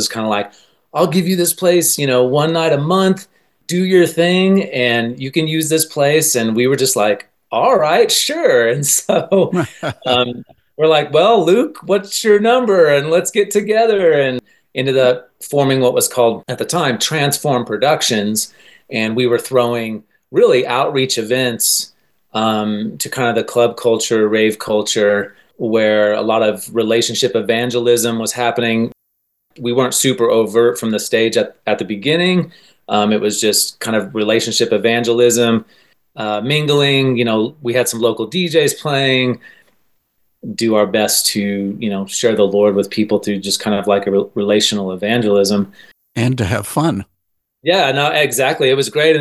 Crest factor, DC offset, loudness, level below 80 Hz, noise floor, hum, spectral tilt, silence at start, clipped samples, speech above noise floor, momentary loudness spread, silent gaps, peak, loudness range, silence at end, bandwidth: 14 dB; 0.1%; -15 LUFS; -54 dBFS; -71 dBFS; none; -4 dB/octave; 0 s; under 0.1%; 56 dB; 8 LU; none; 0 dBFS; 3 LU; 0 s; 13 kHz